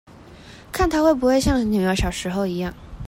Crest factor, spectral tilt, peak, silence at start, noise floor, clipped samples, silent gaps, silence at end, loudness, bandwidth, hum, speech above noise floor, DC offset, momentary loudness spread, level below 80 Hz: 16 dB; -5.5 dB/octave; -6 dBFS; 0.2 s; -43 dBFS; under 0.1%; none; 0 s; -21 LUFS; 16.5 kHz; none; 23 dB; under 0.1%; 10 LU; -34 dBFS